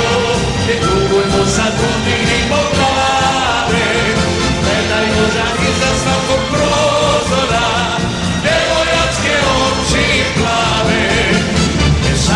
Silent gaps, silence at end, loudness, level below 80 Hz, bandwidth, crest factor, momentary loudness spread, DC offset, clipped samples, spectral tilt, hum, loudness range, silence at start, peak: none; 0 s; -13 LUFS; -26 dBFS; 14 kHz; 14 dB; 2 LU; under 0.1%; under 0.1%; -4 dB/octave; none; 1 LU; 0 s; 0 dBFS